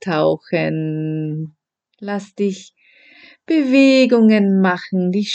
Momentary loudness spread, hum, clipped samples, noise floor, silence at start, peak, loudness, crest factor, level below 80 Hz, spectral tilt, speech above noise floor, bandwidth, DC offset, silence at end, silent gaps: 15 LU; none; under 0.1%; -48 dBFS; 0.05 s; -2 dBFS; -16 LUFS; 16 dB; -68 dBFS; -6.5 dB/octave; 32 dB; 8.4 kHz; under 0.1%; 0 s; none